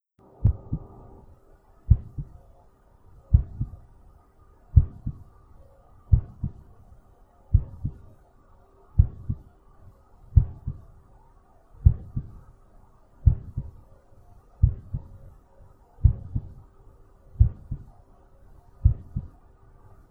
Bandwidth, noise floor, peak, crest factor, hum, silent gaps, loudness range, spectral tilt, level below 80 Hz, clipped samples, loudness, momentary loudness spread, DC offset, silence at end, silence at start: 1.6 kHz; -56 dBFS; -2 dBFS; 26 dB; none; none; 3 LU; -12.5 dB/octave; -30 dBFS; under 0.1%; -27 LUFS; 20 LU; under 0.1%; 0.85 s; 0.4 s